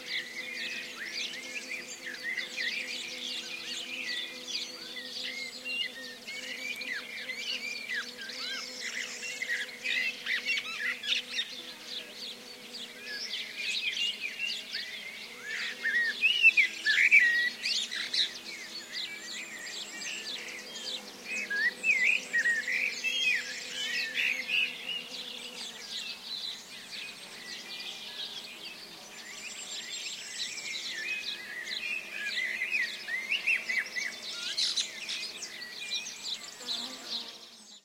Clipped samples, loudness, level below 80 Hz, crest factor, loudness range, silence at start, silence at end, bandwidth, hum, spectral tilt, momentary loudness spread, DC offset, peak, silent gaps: under 0.1%; -31 LUFS; -84 dBFS; 24 dB; 12 LU; 0 s; 0.05 s; 16 kHz; none; 1 dB/octave; 13 LU; under 0.1%; -10 dBFS; none